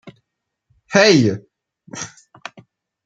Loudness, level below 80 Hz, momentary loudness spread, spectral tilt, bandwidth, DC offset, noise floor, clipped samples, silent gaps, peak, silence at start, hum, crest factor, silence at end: -14 LUFS; -64 dBFS; 25 LU; -4.5 dB/octave; 9.2 kHz; under 0.1%; -78 dBFS; under 0.1%; none; -2 dBFS; 0.05 s; none; 20 dB; 1 s